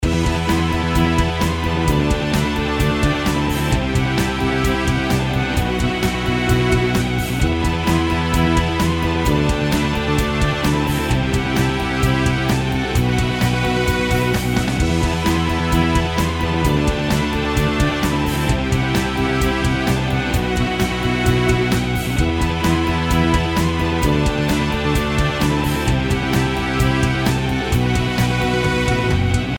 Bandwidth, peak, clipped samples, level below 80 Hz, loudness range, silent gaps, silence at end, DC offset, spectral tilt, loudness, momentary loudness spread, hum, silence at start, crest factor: 19 kHz; -4 dBFS; under 0.1%; -26 dBFS; 1 LU; none; 0 s; under 0.1%; -5.5 dB/octave; -18 LUFS; 2 LU; none; 0 s; 14 dB